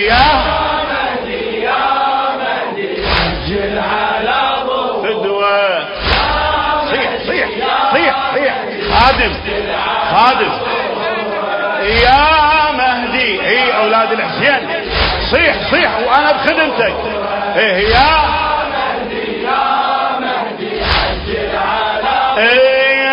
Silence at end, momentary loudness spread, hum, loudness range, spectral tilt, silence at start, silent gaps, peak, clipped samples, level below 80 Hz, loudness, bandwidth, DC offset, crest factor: 0 s; 8 LU; none; 4 LU; -6.5 dB/octave; 0 s; none; 0 dBFS; under 0.1%; -30 dBFS; -13 LUFS; 8 kHz; under 0.1%; 14 dB